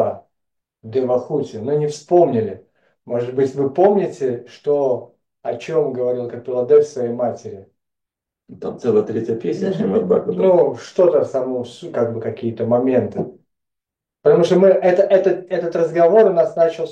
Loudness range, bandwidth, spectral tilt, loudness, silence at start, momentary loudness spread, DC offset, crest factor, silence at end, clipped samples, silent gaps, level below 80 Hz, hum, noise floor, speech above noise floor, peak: 5 LU; 8.8 kHz; -7.5 dB/octave; -18 LUFS; 0 s; 13 LU; under 0.1%; 16 dB; 0 s; under 0.1%; none; -66 dBFS; none; -84 dBFS; 67 dB; -2 dBFS